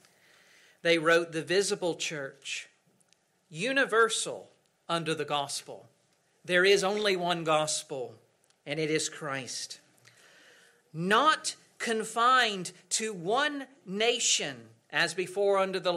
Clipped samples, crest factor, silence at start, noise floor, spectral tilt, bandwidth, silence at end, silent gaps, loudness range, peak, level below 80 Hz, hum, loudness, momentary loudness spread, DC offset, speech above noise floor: under 0.1%; 18 dB; 0.85 s; -70 dBFS; -2.5 dB/octave; 15.5 kHz; 0 s; none; 4 LU; -12 dBFS; -80 dBFS; none; -28 LUFS; 15 LU; under 0.1%; 41 dB